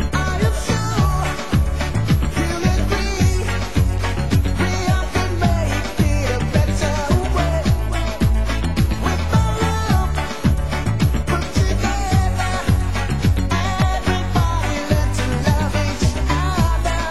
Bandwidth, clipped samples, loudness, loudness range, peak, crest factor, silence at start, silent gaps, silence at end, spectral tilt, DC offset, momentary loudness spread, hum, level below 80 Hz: 12.5 kHz; under 0.1%; -19 LUFS; 0 LU; -2 dBFS; 16 dB; 0 s; none; 0 s; -5.5 dB/octave; 3%; 3 LU; none; -22 dBFS